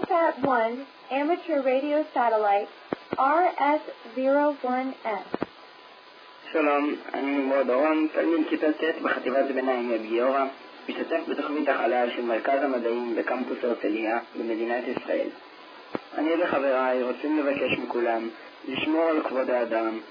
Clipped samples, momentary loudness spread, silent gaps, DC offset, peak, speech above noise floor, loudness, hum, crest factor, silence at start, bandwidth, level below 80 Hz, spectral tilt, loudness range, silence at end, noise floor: under 0.1%; 11 LU; none; under 0.1%; -10 dBFS; 23 dB; -26 LUFS; none; 16 dB; 0 s; 5.2 kHz; -74 dBFS; -7 dB/octave; 3 LU; 0 s; -49 dBFS